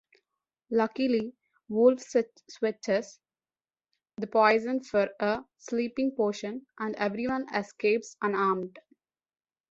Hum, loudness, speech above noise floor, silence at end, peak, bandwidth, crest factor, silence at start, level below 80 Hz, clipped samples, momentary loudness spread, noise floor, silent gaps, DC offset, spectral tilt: none; -29 LUFS; over 62 dB; 0.9 s; -8 dBFS; 8 kHz; 20 dB; 0.7 s; -70 dBFS; under 0.1%; 13 LU; under -90 dBFS; none; under 0.1%; -5.5 dB/octave